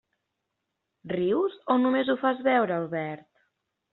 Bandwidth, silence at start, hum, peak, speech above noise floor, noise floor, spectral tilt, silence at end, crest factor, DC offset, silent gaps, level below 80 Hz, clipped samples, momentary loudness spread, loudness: 4.2 kHz; 1.05 s; none; -10 dBFS; 56 dB; -82 dBFS; -4.5 dB/octave; 0.75 s; 18 dB; under 0.1%; none; -72 dBFS; under 0.1%; 10 LU; -26 LUFS